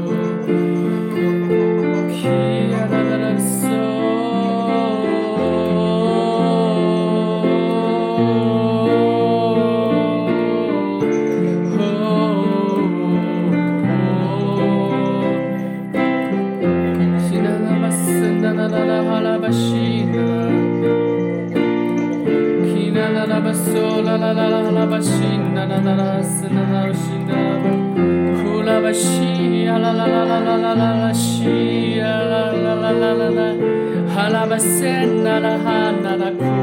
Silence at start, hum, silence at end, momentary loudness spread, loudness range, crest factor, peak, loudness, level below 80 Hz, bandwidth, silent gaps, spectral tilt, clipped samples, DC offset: 0 s; none; 0 s; 3 LU; 2 LU; 12 dB; -4 dBFS; -17 LUFS; -60 dBFS; 16.5 kHz; none; -6 dB/octave; under 0.1%; under 0.1%